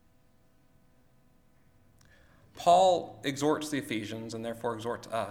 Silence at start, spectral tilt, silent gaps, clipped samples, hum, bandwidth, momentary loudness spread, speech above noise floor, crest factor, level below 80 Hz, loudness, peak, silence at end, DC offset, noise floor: 2.55 s; -4.5 dB/octave; none; under 0.1%; none; 16.5 kHz; 14 LU; 34 dB; 20 dB; -66 dBFS; -29 LUFS; -12 dBFS; 0 s; under 0.1%; -63 dBFS